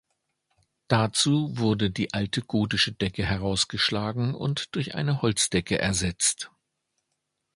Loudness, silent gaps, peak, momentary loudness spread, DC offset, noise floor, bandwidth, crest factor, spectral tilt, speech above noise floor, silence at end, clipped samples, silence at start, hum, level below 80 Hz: -25 LUFS; none; -4 dBFS; 6 LU; under 0.1%; -80 dBFS; 11.5 kHz; 22 dB; -4 dB/octave; 54 dB; 1.1 s; under 0.1%; 0.9 s; none; -48 dBFS